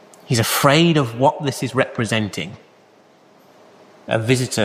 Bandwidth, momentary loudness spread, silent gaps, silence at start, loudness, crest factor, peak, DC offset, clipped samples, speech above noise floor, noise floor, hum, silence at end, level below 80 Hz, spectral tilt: 15.5 kHz; 10 LU; none; 0.3 s; -18 LUFS; 18 dB; -2 dBFS; under 0.1%; under 0.1%; 33 dB; -51 dBFS; none; 0 s; -56 dBFS; -4.5 dB/octave